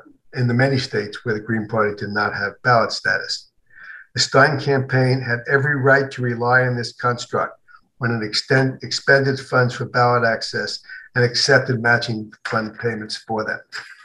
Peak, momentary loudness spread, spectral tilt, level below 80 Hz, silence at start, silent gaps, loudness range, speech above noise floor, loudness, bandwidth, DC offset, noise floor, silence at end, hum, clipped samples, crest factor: 0 dBFS; 11 LU; -5 dB/octave; -62 dBFS; 0.35 s; none; 3 LU; 22 dB; -19 LUFS; 10.5 kHz; under 0.1%; -42 dBFS; 0.1 s; none; under 0.1%; 20 dB